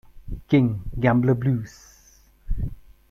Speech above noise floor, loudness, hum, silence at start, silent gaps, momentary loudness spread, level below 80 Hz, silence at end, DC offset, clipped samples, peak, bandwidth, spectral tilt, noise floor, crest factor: 34 dB; -23 LUFS; none; 0.15 s; none; 19 LU; -36 dBFS; 0.35 s; under 0.1%; under 0.1%; -6 dBFS; 13.5 kHz; -8.5 dB/octave; -55 dBFS; 18 dB